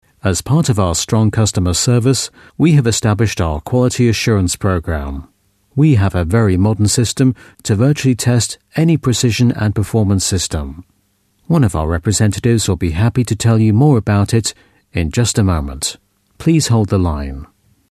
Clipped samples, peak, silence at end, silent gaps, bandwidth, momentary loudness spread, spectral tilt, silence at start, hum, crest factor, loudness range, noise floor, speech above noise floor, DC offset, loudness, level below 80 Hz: under 0.1%; 0 dBFS; 0.45 s; none; 14 kHz; 9 LU; -5.5 dB/octave; 0.25 s; none; 14 dB; 2 LU; -60 dBFS; 46 dB; under 0.1%; -15 LUFS; -32 dBFS